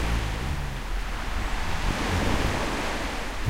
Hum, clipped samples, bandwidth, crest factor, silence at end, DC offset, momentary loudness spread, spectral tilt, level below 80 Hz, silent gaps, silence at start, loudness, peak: none; under 0.1%; 16 kHz; 16 dB; 0 s; under 0.1%; 7 LU; -4.5 dB/octave; -30 dBFS; none; 0 s; -29 LUFS; -10 dBFS